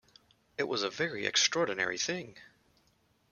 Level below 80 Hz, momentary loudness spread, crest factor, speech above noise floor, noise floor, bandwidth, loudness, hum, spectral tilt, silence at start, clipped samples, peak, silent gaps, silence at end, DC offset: -74 dBFS; 13 LU; 22 dB; 38 dB; -71 dBFS; 11 kHz; -31 LUFS; none; -1.5 dB/octave; 0.6 s; under 0.1%; -12 dBFS; none; 0.85 s; under 0.1%